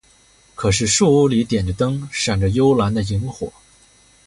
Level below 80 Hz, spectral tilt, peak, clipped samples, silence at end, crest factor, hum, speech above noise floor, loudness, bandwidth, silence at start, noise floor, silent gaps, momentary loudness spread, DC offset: -38 dBFS; -5 dB/octave; -4 dBFS; under 0.1%; 0.75 s; 16 dB; none; 36 dB; -18 LUFS; 11.5 kHz; 0.6 s; -53 dBFS; none; 10 LU; under 0.1%